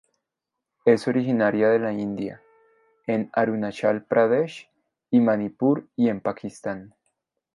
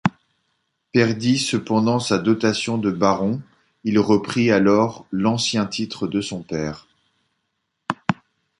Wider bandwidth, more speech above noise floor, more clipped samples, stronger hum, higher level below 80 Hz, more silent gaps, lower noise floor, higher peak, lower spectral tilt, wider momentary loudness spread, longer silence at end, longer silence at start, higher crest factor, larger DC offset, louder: about the same, 11.5 kHz vs 11.5 kHz; first, 62 dB vs 55 dB; neither; neither; second, -68 dBFS vs -54 dBFS; neither; first, -85 dBFS vs -75 dBFS; about the same, -4 dBFS vs -2 dBFS; first, -7.5 dB/octave vs -5.5 dB/octave; first, 13 LU vs 10 LU; first, 0.7 s vs 0.45 s; first, 0.85 s vs 0.05 s; about the same, 20 dB vs 20 dB; neither; about the same, -23 LUFS vs -21 LUFS